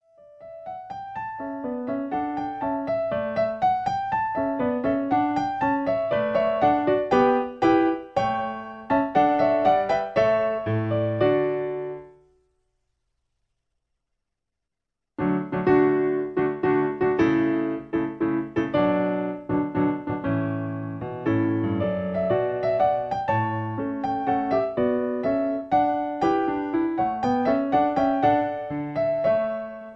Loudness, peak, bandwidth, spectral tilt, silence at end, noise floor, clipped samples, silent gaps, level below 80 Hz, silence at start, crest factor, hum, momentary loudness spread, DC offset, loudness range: -24 LUFS; -8 dBFS; 7.4 kHz; -8.5 dB/octave; 0 s; -85 dBFS; under 0.1%; none; -54 dBFS; 0.4 s; 16 dB; none; 9 LU; under 0.1%; 6 LU